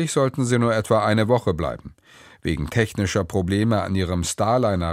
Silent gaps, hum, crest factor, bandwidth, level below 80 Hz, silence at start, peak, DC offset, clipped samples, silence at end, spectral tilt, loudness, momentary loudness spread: none; none; 18 dB; 15.5 kHz; -42 dBFS; 0 s; -2 dBFS; under 0.1%; under 0.1%; 0 s; -5.5 dB/octave; -22 LUFS; 8 LU